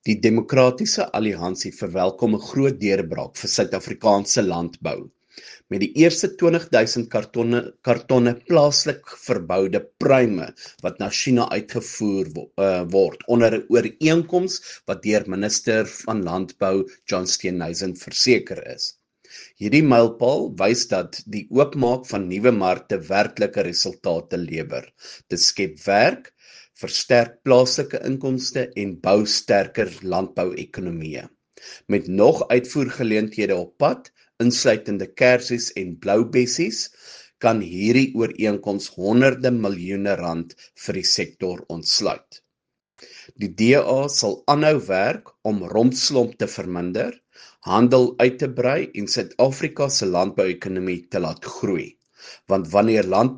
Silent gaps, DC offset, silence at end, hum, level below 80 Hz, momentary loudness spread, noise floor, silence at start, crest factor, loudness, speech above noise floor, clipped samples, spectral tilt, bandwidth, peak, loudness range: none; under 0.1%; 0 s; none; -60 dBFS; 12 LU; -83 dBFS; 0.05 s; 20 dB; -21 LUFS; 62 dB; under 0.1%; -4.5 dB/octave; 10 kHz; 0 dBFS; 3 LU